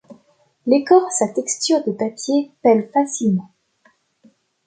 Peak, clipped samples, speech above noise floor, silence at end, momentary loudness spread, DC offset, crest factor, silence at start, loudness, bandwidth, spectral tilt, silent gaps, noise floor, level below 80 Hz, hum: 0 dBFS; under 0.1%; 42 dB; 1.2 s; 9 LU; under 0.1%; 18 dB; 0.1 s; -18 LUFS; 9.4 kHz; -4.5 dB/octave; none; -60 dBFS; -68 dBFS; none